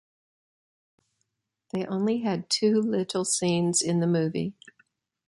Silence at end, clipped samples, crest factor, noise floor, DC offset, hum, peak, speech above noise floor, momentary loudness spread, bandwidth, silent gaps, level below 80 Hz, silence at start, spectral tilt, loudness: 0.75 s; under 0.1%; 16 dB; -79 dBFS; under 0.1%; none; -12 dBFS; 54 dB; 9 LU; 11.5 kHz; none; -70 dBFS; 1.75 s; -4.5 dB/octave; -26 LUFS